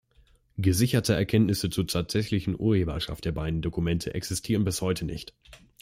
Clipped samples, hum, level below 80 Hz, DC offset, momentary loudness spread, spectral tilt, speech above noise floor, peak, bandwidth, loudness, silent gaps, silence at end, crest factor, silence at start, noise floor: under 0.1%; none; -46 dBFS; under 0.1%; 8 LU; -5.5 dB/octave; 35 dB; -8 dBFS; 16.5 kHz; -27 LUFS; none; 0.25 s; 18 dB; 0.55 s; -61 dBFS